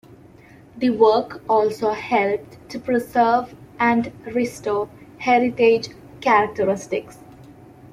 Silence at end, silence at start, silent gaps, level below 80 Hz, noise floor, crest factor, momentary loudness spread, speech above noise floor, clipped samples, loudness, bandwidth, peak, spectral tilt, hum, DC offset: 0.05 s; 0.75 s; none; -58 dBFS; -47 dBFS; 18 dB; 12 LU; 27 dB; under 0.1%; -20 LUFS; 15 kHz; -4 dBFS; -5.5 dB/octave; none; under 0.1%